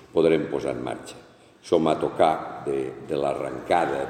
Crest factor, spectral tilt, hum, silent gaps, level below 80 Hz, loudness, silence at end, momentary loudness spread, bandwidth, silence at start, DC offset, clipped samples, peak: 18 dB; -6 dB/octave; none; none; -56 dBFS; -25 LUFS; 0 s; 10 LU; 13.5 kHz; 0 s; under 0.1%; under 0.1%; -6 dBFS